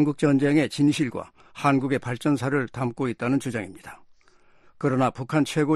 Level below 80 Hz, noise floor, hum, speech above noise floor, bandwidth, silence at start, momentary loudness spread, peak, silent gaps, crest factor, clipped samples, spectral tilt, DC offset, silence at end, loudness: -60 dBFS; -56 dBFS; none; 32 dB; 13 kHz; 0 s; 13 LU; -6 dBFS; none; 18 dB; under 0.1%; -6.5 dB/octave; under 0.1%; 0 s; -24 LUFS